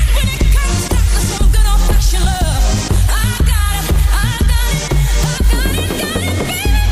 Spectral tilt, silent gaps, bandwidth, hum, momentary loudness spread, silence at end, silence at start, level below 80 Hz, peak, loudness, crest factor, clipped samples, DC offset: -4.5 dB/octave; none; 16 kHz; none; 3 LU; 0 s; 0 s; -14 dBFS; -4 dBFS; -15 LUFS; 8 dB; under 0.1%; under 0.1%